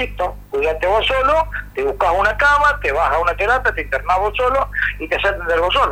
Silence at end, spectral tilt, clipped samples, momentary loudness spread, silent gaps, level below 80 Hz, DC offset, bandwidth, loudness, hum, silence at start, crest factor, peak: 0 s; -4.5 dB/octave; under 0.1%; 8 LU; none; -32 dBFS; under 0.1%; 16.5 kHz; -17 LUFS; 50 Hz at -30 dBFS; 0 s; 12 dB; -4 dBFS